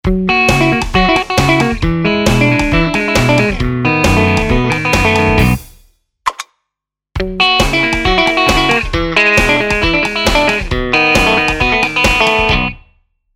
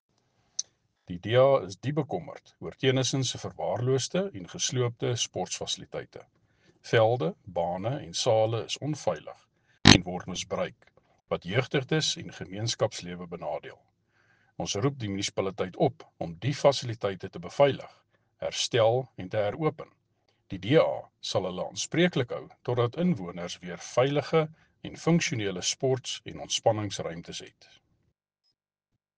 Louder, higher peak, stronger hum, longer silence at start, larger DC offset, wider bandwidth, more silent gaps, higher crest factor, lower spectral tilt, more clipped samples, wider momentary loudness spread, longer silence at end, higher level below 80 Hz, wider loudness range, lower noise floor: first, -11 LUFS vs -28 LUFS; about the same, 0 dBFS vs -2 dBFS; neither; second, 0.05 s vs 0.6 s; first, 0.3% vs under 0.1%; first, 17.5 kHz vs 10 kHz; neither; second, 12 dB vs 28 dB; about the same, -4.5 dB/octave vs -4.5 dB/octave; neither; second, 6 LU vs 15 LU; second, 0.6 s vs 1.7 s; first, -24 dBFS vs -58 dBFS; second, 3 LU vs 6 LU; second, -80 dBFS vs -84 dBFS